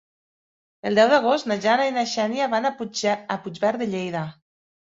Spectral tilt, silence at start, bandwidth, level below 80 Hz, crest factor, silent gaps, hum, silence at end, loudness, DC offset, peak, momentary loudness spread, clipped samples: -4.5 dB/octave; 0.85 s; 7.8 kHz; -68 dBFS; 20 dB; none; none; 0.55 s; -22 LUFS; under 0.1%; -4 dBFS; 12 LU; under 0.1%